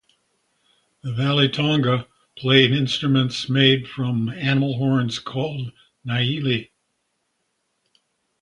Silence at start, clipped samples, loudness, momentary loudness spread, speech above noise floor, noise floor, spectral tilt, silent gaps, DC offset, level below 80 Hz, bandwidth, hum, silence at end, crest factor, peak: 1.05 s; under 0.1%; -20 LUFS; 12 LU; 53 dB; -73 dBFS; -6 dB/octave; none; under 0.1%; -58 dBFS; 10.5 kHz; none; 1.8 s; 22 dB; 0 dBFS